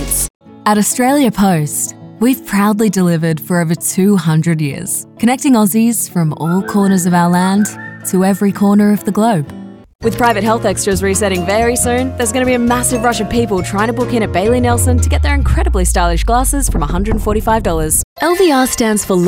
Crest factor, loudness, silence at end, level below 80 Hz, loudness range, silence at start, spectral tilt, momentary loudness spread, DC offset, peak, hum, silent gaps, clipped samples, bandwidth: 10 dB; -13 LUFS; 0 s; -24 dBFS; 1 LU; 0 s; -5 dB/octave; 5 LU; under 0.1%; -2 dBFS; none; 0.30-0.40 s, 9.95-9.99 s, 18.04-18.16 s; under 0.1%; 18 kHz